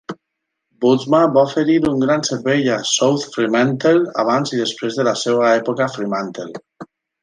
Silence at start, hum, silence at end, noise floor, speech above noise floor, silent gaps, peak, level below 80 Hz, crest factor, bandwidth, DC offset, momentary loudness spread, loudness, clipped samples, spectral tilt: 0.1 s; none; 0.4 s; -77 dBFS; 61 dB; none; -2 dBFS; -58 dBFS; 14 dB; 10 kHz; under 0.1%; 9 LU; -17 LUFS; under 0.1%; -4.5 dB/octave